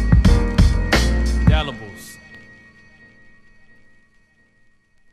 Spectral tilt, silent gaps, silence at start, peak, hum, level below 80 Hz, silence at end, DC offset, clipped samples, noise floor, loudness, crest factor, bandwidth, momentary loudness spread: -6 dB/octave; none; 0 s; 0 dBFS; none; -22 dBFS; 2.75 s; under 0.1%; under 0.1%; -56 dBFS; -18 LUFS; 18 dB; 14 kHz; 24 LU